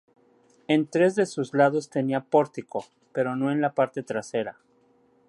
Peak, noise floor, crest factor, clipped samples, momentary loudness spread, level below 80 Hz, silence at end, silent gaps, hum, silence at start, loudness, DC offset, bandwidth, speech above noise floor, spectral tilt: -6 dBFS; -63 dBFS; 20 dB; under 0.1%; 12 LU; -74 dBFS; 0.8 s; none; none; 0.7 s; -25 LUFS; under 0.1%; 11.5 kHz; 38 dB; -6.5 dB/octave